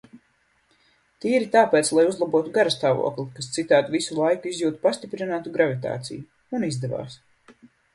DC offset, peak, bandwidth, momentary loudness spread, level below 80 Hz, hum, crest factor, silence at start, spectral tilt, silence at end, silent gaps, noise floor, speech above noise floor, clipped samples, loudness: under 0.1%; -4 dBFS; 11.5 kHz; 13 LU; -66 dBFS; none; 20 dB; 0.15 s; -4.5 dB/octave; 0.8 s; none; -66 dBFS; 43 dB; under 0.1%; -23 LUFS